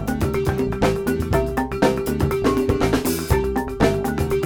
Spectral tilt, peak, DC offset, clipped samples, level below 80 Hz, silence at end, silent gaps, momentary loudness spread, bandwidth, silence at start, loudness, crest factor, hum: -6 dB/octave; -4 dBFS; under 0.1%; under 0.1%; -30 dBFS; 0 s; none; 3 LU; over 20 kHz; 0 s; -21 LUFS; 16 dB; none